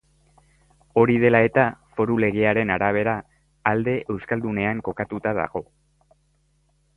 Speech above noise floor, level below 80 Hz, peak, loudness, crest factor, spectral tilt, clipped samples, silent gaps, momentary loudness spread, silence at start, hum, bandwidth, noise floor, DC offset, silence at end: 43 dB; -52 dBFS; -2 dBFS; -22 LUFS; 22 dB; -9 dB/octave; under 0.1%; none; 10 LU; 0.95 s; none; 4.2 kHz; -65 dBFS; under 0.1%; 1.35 s